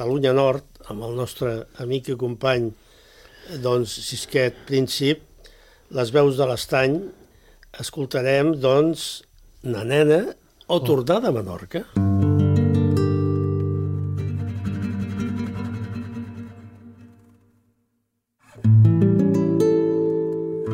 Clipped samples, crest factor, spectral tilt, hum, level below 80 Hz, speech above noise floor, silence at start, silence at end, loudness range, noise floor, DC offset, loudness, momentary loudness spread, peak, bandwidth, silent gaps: under 0.1%; 18 dB; -6.5 dB/octave; none; -52 dBFS; 52 dB; 0 s; 0 s; 8 LU; -74 dBFS; under 0.1%; -22 LUFS; 13 LU; -4 dBFS; 16.5 kHz; none